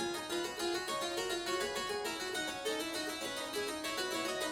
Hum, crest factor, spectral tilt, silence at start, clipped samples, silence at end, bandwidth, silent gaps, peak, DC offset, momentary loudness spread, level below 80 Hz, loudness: none; 14 dB; -1.5 dB/octave; 0 s; under 0.1%; 0 s; 19.5 kHz; none; -24 dBFS; under 0.1%; 2 LU; -66 dBFS; -37 LUFS